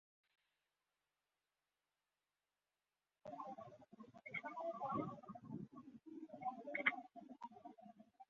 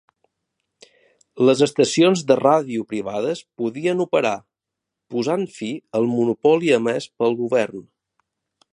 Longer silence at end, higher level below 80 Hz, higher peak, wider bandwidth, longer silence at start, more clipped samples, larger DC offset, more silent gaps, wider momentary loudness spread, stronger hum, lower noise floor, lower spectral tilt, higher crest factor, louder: second, 0.05 s vs 0.9 s; second, -88 dBFS vs -68 dBFS; second, -20 dBFS vs -2 dBFS; second, 7 kHz vs 11.5 kHz; first, 3.25 s vs 1.35 s; neither; neither; neither; first, 20 LU vs 11 LU; first, 50 Hz at -80 dBFS vs none; first, under -90 dBFS vs -84 dBFS; second, -3.5 dB/octave vs -5 dB/octave; first, 32 dB vs 20 dB; second, -48 LUFS vs -20 LUFS